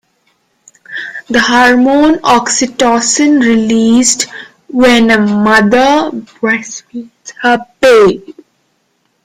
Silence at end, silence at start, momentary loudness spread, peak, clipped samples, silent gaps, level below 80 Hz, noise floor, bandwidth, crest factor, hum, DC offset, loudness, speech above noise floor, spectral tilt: 0.95 s; 0.9 s; 16 LU; 0 dBFS; under 0.1%; none; -44 dBFS; -60 dBFS; 15 kHz; 10 dB; none; under 0.1%; -9 LUFS; 51 dB; -3 dB/octave